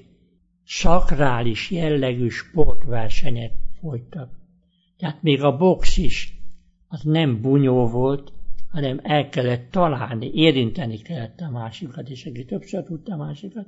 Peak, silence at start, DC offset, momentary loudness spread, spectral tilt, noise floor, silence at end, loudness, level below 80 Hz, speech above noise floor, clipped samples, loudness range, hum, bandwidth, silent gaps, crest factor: 0 dBFS; 0.7 s; under 0.1%; 16 LU; -6.5 dB/octave; -61 dBFS; 0.05 s; -22 LUFS; -30 dBFS; 44 dB; under 0.1%; 5 LU; none; 7.8 kHz; none; 18 dB